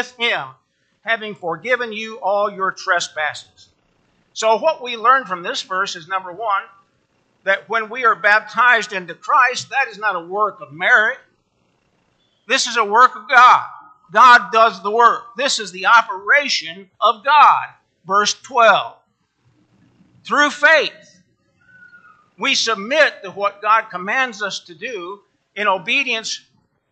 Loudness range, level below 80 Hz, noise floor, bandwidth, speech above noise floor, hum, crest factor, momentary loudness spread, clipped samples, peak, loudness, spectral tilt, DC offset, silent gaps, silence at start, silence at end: 8 LU; -76 dBFS; -64 dBFS; 9 kHz; 47 dB; none; 18 dB; 14 LU; under 0.1%; 0 dBFS; -16 LUFS; -1.5 dB/octave; under 0.1%; none; 0 s; 0.55 s